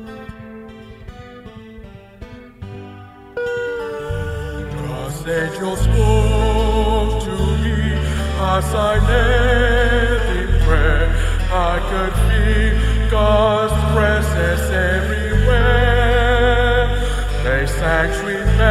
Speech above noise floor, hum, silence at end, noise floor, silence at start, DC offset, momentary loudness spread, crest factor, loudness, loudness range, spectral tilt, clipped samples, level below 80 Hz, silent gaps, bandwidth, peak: 23 dB; none; 0 s; -38 dBFS; 0 s; under 0.1%; 21 LU; 14 dB; -17 LUFS; 12 LU; -6 dB/octave; under 0.1%; -20 dBFS; none; 13.5 kHz; -2 dBFS